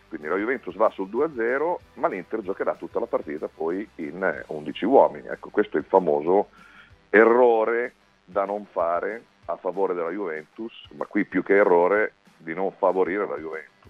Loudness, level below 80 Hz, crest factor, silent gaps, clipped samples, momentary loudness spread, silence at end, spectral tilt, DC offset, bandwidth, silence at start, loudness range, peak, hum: -24 LUFS; -64 dBFS; 22 dB; none; under 0.1%; 15 LU; 0.25 s; -7.5 dB/octave; under 0.1%; 6 kHz; 0.1 s; 7 LU; -2 dBFS; none